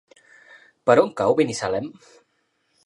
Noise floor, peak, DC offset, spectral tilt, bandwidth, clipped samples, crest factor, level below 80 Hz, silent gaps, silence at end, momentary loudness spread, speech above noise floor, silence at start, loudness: -70 dBFS; -2 dBFS; under 0.1%; -5 dB/octave; 11 kHz; under 0.1%; 22 dB; -62 dBFS; none; 0.95 s; 11 LU; 49 dB; 0.85 s; -21 LUFS